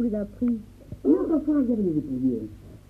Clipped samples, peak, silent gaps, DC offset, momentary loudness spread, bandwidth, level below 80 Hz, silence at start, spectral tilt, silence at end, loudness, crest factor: under 0.1%; -10 dBFS; none; under 0.1%; 10 LU; 4.5 kHz; -48 dBFS; 0 s; -10.5 dB/octave; 0.1 s; -25 LUFS; 16 dB